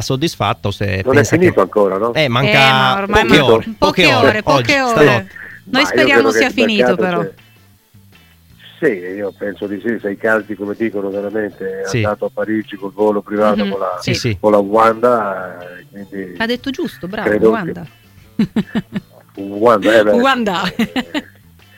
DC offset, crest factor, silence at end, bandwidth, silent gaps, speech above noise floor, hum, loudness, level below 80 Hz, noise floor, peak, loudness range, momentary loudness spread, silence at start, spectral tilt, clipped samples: under 0.1%; 16 dB; 0.55 s; 17 kHz; none; 34 dB; none; -14 LUFS; -42 dBFS; -48 dBFS; 0 dBFS; 9 LU; 15 LU; 0 s; -5 dB/octave; under 0.1%